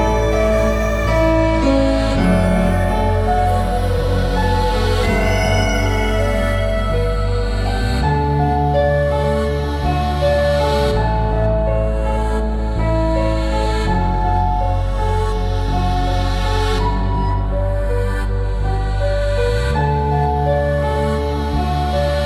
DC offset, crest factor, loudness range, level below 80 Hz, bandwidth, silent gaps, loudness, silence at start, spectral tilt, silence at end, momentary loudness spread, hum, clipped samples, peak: under 0.1%; 12 dB; 3 LU; -20 dBFS; 13 kHz; none; -18 LUFS; 0 s; -6.5 dB/octave; 0 s; 4 LU; none; under 0.1%; -4 dBFS